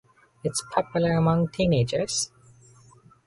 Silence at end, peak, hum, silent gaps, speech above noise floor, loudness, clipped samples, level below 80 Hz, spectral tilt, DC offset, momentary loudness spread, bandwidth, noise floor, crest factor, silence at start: 1 s; -6 dBFS; none; none; 31 dB; -25 LUFS; under 0.1%; -52 dBFS; -5 dB/octave; under 0.1%; 7 LU; 11.5 kHz; -55 dBFS; 20 dB; 0.45 s